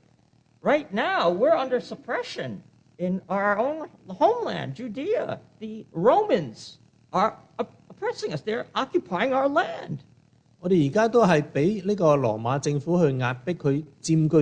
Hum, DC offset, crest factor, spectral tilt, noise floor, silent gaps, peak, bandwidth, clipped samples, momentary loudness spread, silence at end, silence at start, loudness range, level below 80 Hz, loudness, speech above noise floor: none; under 0.1%; 18 dB; -6.5 dB/octave; -61 dBFS; none; -8 dBFS; 9.8 kHz; under 0.1%; 14 LU; 0 s; 0.65 s; 5 LU; -64 dBFS; -25 LUFS; 37 dB